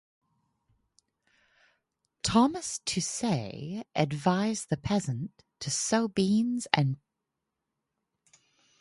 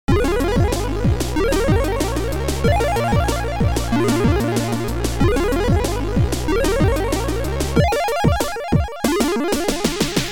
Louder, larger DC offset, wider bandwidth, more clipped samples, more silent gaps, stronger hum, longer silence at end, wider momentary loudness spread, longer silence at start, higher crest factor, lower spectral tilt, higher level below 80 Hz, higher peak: second, -29 LUFS vs -19 LUFS; second, under 0.1% vs 1%; second, 11.5 kHz vs 19 kHz; neither; neither; neither; first, 1.85 s vs 0 s; first, 12 LU vs 4 LU; first, 2.25 s vs 0.05 s; first, 30 dB vs 14 dB; about the same, -4.5 dB/octave vs -5.5 dB/octave; second, -60 dBFS vs -26 dBFS; about the same, -2 dBFS vs -4 dBFS